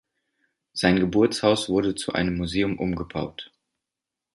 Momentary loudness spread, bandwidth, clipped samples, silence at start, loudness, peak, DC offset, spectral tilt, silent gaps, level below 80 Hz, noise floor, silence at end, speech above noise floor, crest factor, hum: 14 LU; 11.5 kHz; under 0.1%; 0.75 s; -24 LUFS; -2 dBFS; under 0.1%; -5.5 dB/octave; none; -48 dBFS; -87 dBFS; 0.9 s; 64 dB; 22 dB; none